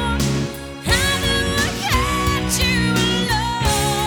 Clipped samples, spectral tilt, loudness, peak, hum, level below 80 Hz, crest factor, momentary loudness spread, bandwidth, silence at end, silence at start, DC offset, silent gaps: under 0.1%; -3.5 dB/octave; -18 LUFS; -2 dBFS; none; -28 dBFS; 16 dB; 4 LU; over 20 kHz; 0 s; 0 s; under 0.1%; none